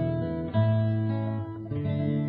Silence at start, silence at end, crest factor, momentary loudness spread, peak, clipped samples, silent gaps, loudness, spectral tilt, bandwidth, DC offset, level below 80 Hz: 0 s; 0 s; 14 dB; 8 LU; -12 dBFS; under 0.1%; none; -28 LUFS; -12 dB/octave; 4.4 kHz; under 0.1%; -50 dBFS